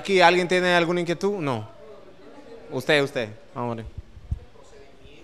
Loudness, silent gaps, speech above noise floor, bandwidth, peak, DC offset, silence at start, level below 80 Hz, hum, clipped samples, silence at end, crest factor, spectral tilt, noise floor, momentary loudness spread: -23 LUFS; none; 27 dB; 13.5 kHz; 0 dBFS; 0.4%; 0 s; -46 dBFS; none; under 0.1%; 0.8 s; 24 dB; -5 dB/octave; -49 dBFS; 20 LU